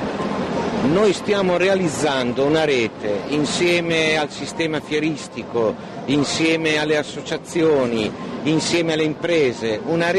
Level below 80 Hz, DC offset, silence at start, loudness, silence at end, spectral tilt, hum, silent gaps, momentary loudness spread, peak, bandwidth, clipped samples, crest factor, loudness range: -52 dBFS; under 0.1%; 0 s; -20 LUFS; 0 s; -4.5 dB/octave; none; none; 7 LU; -8 dBFS; 12.5 kHz; under 0.1%; 12 dB; 2 LU